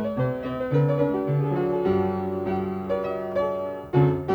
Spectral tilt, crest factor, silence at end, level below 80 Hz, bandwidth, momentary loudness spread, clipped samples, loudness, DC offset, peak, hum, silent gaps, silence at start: -10 dB/octave; 18 dB; 0 s; -52 dBFS; 4.9 kHz; 6 LU; under 0.1%; -25 LUFS; under 0.1%; -8 dBFS; none; none; 0 s